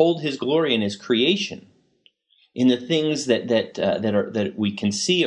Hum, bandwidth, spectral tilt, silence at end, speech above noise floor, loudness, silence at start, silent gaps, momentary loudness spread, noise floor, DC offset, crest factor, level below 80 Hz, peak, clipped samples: none; 11 kHz; -4.5 dB/octave; 0 s; 40 dB; -22 LUFS; 0 s; none; 5 LU; -62 dBFS; under 0.1%; 18 dB; -70 dBFS; -4 dBFS; under 0.1%